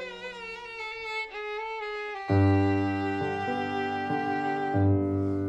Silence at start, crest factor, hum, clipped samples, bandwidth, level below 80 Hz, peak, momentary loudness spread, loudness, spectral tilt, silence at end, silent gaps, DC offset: 0 s; 16 dB; none; under 0.1%; 8 kHz; -64 dBFS; -12 dBFS; 12 LU; -29 LUFS; -8 dB/octave; 0 s; none; under 0.1%